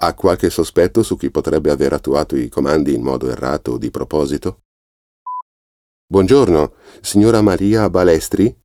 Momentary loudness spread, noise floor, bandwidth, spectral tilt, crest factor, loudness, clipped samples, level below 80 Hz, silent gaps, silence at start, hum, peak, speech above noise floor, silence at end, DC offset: 11 LU; under -90 dBFS; 16.5 kHz; -6 dB/octave; 14 dB; -15 LUFS; under 0.1%; -38 dBFS; 4.65-5.26 s, 5.42-6.08 s; 0 s; none; 0 dBFS; over 75 dB; 0.1 s; under 0.1%